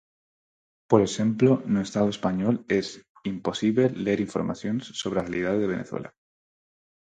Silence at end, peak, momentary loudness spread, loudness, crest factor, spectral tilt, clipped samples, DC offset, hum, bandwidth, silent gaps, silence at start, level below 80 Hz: 0.95 s; -6 dBFS; 11 LU; -25 LUFS; 20 dB; -6 dB/octave; under 0.1%; under 0.1%; none; 9.2 kHz; 3.09-3.15 s; 0.9 s; -58 dBFS